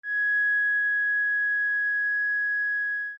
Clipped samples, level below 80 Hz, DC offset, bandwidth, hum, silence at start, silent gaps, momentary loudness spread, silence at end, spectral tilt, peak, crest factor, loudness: under 0.1%; under -90 dBFS; under 0.1%; 5.4 kHz; none; 0.05 s; none; 3 LU; 0 s; 3.5 dB/octave; -20 dBFS; 6 dB; -23 LUFS